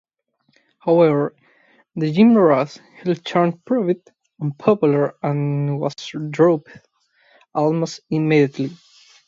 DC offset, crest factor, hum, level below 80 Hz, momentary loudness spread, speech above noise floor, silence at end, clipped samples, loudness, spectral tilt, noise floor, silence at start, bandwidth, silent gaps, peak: under 0.1%; 18 dB; none; -68 dBFS; 13 LU; 49 dB; 0.55 s; under 0.1%; -19 LUFS; -7.5 dB/octave; -67 dBFS; 0.85 s; 7.6 kHz; none; -2 dBFS